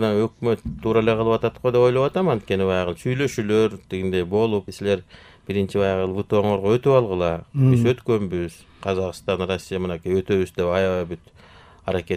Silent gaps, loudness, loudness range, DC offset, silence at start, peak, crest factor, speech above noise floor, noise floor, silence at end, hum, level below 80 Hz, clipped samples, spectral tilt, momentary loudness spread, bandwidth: none; -22 LUFS; 4 LU; under 0.1%; 0 s; -4 dBFS; 18 dB; 27 dB; -48 dBFS; 0 s; none; -48 dBFS; under 0.1%; -7 dB/octave; 9 LU; 14.5 kHz